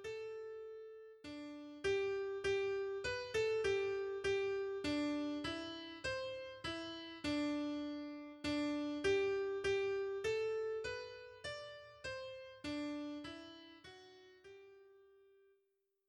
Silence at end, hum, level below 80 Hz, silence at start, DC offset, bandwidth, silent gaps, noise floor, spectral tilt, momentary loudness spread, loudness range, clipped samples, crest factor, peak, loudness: 1.05 s; none; -68 dBFS; 0 s; under 0.1%; 11.5 kHz; none; -83 dBFS; -4.5 dB/octave; 16 LU; 10 LU; under 0.1%; 18 dB; -24 dBFS; -41 LUFS